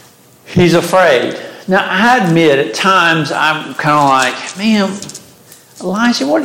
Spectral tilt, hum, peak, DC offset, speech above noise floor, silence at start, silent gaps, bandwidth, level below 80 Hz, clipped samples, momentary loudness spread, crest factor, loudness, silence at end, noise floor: -4.5 dB/octave; none; 0 dBFS; under 0.1%; 30 dB; 0.45 s; none; 17 kHz; -50 dBFS; under 0.1%; 10 LU; 12 dB; -12 LUFS; 0 s; -41 dBFS